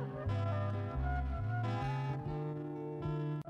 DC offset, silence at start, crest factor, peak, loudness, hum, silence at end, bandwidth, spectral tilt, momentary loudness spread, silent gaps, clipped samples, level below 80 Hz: under 0.1%; 0 s; 10 dB; -26 dBFS; -38 LUFS; none; 0 s; 7.2 kHz; -9 dB/octave; 5 LU; none; under 0.1%; -46 dBFS